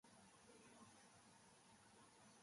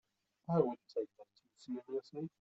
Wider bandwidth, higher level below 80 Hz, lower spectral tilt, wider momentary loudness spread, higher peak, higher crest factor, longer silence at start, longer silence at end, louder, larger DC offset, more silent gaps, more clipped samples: first, 11.5 kHz vs 8 kHz; second, under -90 dBFS vs -82 dBFS; second, -3 dB/octave vs -9 dB/octave; second, 3 LU vs 15 LU; second, -54 dBFS vs -18 dBFS; second, 14 dB vs 22 dB; second, 0.05 s vs 0.5 s; about the same, 0 s vs 0.1 s; second, -68 LUFS vs -40 LUFS; neither; neither; neither